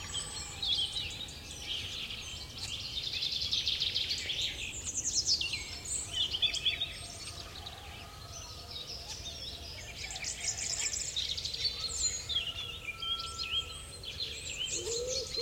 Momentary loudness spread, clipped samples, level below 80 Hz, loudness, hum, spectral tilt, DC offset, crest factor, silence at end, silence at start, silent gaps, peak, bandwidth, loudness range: 12 LU; under 0.1%; -54 dBFS; -34 LUFS; none; -0.5 dB/octave; under 0.1%; 20 dB; 0 s; 0 s; none; -16 dBFS; 16.5 kHz; 7 LU